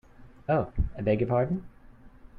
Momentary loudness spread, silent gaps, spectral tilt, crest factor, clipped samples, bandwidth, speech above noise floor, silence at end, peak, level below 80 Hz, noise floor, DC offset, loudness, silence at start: 9 LU; none; -10.5 dB/octave; 16 dB; under 0.1%; 4.9 kHz; 24 dB; 0.2 s; -14 dBFS; -40 dBFS; -51 dBFS; under 0.1%; -28 LUFS; 0.2 s